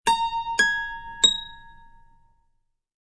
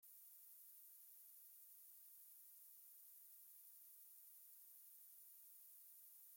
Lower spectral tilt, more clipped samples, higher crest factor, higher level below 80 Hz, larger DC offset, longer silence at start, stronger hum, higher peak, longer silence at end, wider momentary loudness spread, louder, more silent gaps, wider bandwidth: first, 1 dB/octave vs 3 dB/octave; neither; first, 22 dB vs 14 dB; first, -50 dBFS vs under -90 dBFS; neither; about the same, 0.05 s vs 0 s; neither; first, -4 dBFS vs -50 dBFS; first, 1.3 s vs 0 s; first, 13 LU vs 0 LU; first, -22 LUFS vs -61 LUFS; neither; second, 11 kHz vs 17 kHz